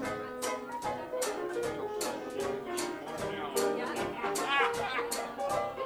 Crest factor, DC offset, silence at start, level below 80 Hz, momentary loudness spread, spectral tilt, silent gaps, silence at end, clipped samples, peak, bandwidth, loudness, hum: 20 dB; under 0.1%; 0 s; -64 dBFS; 7 LU; -2.5 dB/octave; none; 0 s; under 0.1%; -14 dBFS; over 20 kHz; -34 LUFS; none